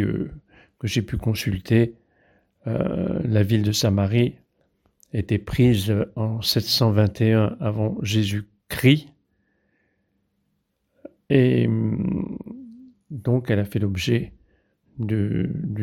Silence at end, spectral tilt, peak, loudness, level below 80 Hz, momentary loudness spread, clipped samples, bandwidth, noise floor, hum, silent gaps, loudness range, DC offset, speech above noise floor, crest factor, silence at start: 0 s; -6.5 dB/octave; -4 dBFS; -22 LUFS; -48 dBFS; 12 LU; under 0.1%; 17 kHz; -73 dBFS; none; none; 5 LU; under 0.1%; 52 dB; 20 dB; 0 s